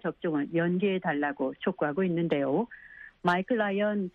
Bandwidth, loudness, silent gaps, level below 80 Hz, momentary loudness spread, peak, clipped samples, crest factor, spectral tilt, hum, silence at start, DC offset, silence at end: 6.8 kHz; -29 LUFS; none; -68 dBFS; 5 LU; -10 dBFS; under 0.1%; 18 dB; -8.5 dB/octave; none; 0.05 s; under 0.1%; 0.05 s